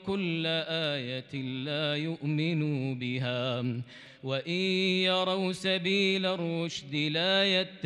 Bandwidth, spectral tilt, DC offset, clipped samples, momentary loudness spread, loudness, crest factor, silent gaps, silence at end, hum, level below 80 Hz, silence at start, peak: 11.5 kHz; -5.5 dB/octave; under 0.1%; under 0.1%; 9 LU; -29 LUFS; 16 dB; none; 0 s; none; -72 dBFS; 0 s; -16 dBFS